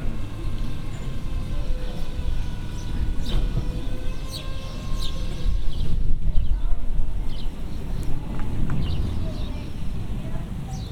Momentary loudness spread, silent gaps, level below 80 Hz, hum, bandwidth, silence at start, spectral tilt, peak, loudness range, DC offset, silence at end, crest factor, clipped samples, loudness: 6 LU; none; -24 dBFS; none; 9.2 kHz; 0 s; -6.5 dB/octave; -4 dBFS; 1 LU; under 0.1%; 0 s; 16 dB; under 0.1%; -31 LUFS